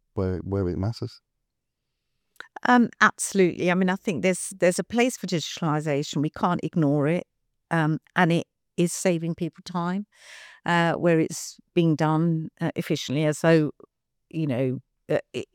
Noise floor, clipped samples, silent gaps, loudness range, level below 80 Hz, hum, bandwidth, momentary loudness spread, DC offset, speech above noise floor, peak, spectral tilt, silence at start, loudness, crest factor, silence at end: -81 dBFS; under 0.1%; none; 3 LU; -64 dBFS; none; 16.5 kHz; 10 LU; under 0.1%; 57 dB; -4 dBFS; -5.5 dB/octave; 0.15 s; -25 LUFS; 22 dB; 0.1 s